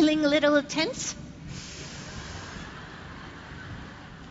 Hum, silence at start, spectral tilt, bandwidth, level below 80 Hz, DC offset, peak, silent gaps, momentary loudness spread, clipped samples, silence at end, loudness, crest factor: none; 0 s; -4 dB/octave; 8 kHz; -50 dBFS; under 0.1%; -10 dBFS; none; 20 LU; under 0.1%; 0 s; -27 LUFS; 20 dB